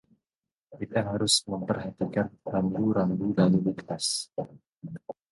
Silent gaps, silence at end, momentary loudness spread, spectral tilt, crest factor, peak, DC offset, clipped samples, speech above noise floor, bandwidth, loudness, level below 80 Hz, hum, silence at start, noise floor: none; 0.2 s; 18 LU; -4.5 dB/octave; 20 dB; -8 dBFS; under 0.1%; under 0.1%; over 63 dB; 11.5 kHz; -27 LUFS; -58 dBFS; none; 0.7 s; under -90 dBFS